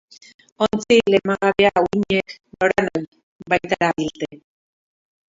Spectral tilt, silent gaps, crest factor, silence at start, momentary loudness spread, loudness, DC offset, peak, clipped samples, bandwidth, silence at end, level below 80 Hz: -5 dB/octave; 3.08-3.12 s, 3.23-3.39 s; 20 dB; 0.6 s; 14 LU; -19 LUFS; under 0.1%; -2 dBFS; under 0.1%; 7.8 kHz; 0.95 s; -52 dBFS